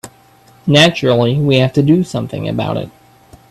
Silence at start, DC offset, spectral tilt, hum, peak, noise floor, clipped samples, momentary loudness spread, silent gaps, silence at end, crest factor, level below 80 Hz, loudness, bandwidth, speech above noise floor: 0.05 s; under 0.1%; -6 dB/octave; none; 0 dBFS; -46 dBFS; under 0.1%; 12 LU; none; 0.6 s; 14 dB; -48 dBFS; -13 LUFS; 12.5 kHz; 34 dB